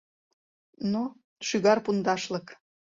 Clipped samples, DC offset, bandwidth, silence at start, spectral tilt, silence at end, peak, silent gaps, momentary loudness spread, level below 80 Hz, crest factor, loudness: under 0.1%; under 0.1%; 7.8 kHz; 0.8 s; -5 dB/octave; 0.45 s; -10 dBFS; 1.24-1.36 s; 12 LU; -70 dBFS; 20 dB; -28 LUFS